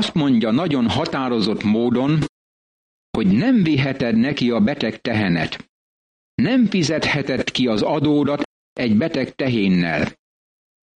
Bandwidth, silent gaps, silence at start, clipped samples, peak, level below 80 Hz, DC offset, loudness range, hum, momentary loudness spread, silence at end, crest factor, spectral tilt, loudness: 9.6 kHz; 2.29-3.13 s, 5.69-6.38 s, 8.45-8.76 s; 0 s; under 0.1%; -8 dBFS; -50 dBFS; under 0.1%; 1 LU; none; 6 LU; 0.85 s; 12 dB; -6.5 dB/octave; -19 LUFS